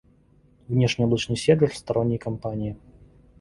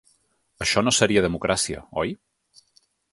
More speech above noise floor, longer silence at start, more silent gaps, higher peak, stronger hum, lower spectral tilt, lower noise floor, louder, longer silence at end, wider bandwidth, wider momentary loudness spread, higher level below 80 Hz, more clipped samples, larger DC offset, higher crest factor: second, 35 dB vs 44 dB; about the same, 0.7 s vs 0.6 s; neither; about the same, -4 dBFS vs -2 dBFS; neither; first, -6.5 dB/octave vs -3 dB/octave; second, -58 dBFS vs -66 dBFS; about the same, -24 LUFS vs -22 LUFS; second, 0.65 s vs 0.95 s; about the same, 11.5 kHz vs 12 kHz; about the same, 11 LU vs 10 LU; about the same, -50 dBFS vs -48 dBFS; neither; neither; about the same, 20 dB vs 22 dB